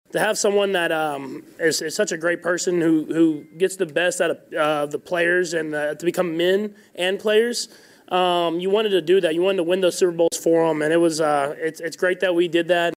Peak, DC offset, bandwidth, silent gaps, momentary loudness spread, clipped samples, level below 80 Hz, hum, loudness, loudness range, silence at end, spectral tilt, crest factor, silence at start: -8 dBFS; under 0.1%; 16 kHz; none; 6 LU; under 0.1%; -74 dBFS; none; -21 LUFS; 3 LU; 0 s; -4 dB/octave; 12 dB; 0.15 s